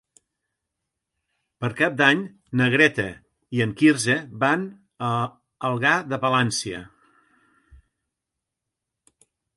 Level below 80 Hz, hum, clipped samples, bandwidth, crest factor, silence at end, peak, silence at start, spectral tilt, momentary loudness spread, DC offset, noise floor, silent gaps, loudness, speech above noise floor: -60 dBFS; none; under 0.1%; 11.5 kHz; 22 dB; 2.7 s; -2 dBFS; 1.6 s; -4.5 dB/octave; 13 LU; under 0.1%; -84 dBFS; none; -22 LUFS; 63 dB